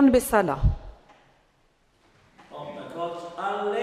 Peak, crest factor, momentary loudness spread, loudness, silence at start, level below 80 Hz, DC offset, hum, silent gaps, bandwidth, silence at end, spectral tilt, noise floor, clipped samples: -6 dBFS; 20 dB; 18 LU; -26 LUFS; 0 s; -36 dBFS; under 0.1%; none; none; 15.5 kHz; 0 s; -6.5 dB/octave; -64 dBFS; under 0.1%